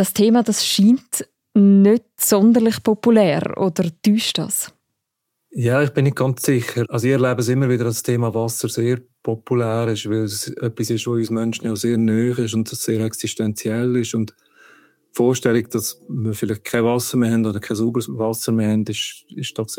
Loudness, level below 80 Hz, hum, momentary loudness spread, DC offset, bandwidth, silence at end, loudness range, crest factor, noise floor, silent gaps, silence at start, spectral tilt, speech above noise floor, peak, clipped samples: -19 LUFS; -64 dBFS; none; 10 LU; under 0.1%; 17 kHz; 0 s; 6 LU; 16 dB; -77 dBFS; none; 0 s; -5.5 dB/octave; 59 dB; -2 dBFS; under 0.1%